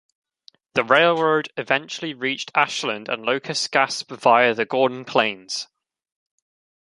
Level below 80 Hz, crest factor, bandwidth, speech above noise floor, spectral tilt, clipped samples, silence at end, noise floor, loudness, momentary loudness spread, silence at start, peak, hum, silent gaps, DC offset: -70 dBFS; 22 dB; 11.5 kHz; 35 dB; -3 dB/octave; under 0.1%; 1.2 s; -56 dBFS; -21 LUFS; 10 LU; 0.75 s; 0 dBFS; none; none; under 0.1%